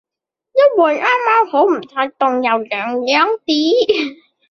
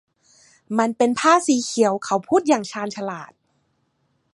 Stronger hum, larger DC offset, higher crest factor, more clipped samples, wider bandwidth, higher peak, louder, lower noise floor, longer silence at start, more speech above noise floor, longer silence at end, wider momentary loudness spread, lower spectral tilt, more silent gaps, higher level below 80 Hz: neither; neither; second, 14 dB vs 20 dB; neither; second, 6.8 kHz vs 11.5 kHz; about the same, -2 dBFS vs -2 dBFS; first, -15 LUFS vs -20 LUFS; first, -84 dBFS vs -68 dBFS; second, 0.55 s vs 0.7 s; first, 69 dB vs 48 dB; second, 0.35 s vs 1.1 s; second, 7 LU vs 13 LU; about the same, -3 dB/octave vs -4 dB/octave; neither; first, -64 dBFS vs -70 dBFS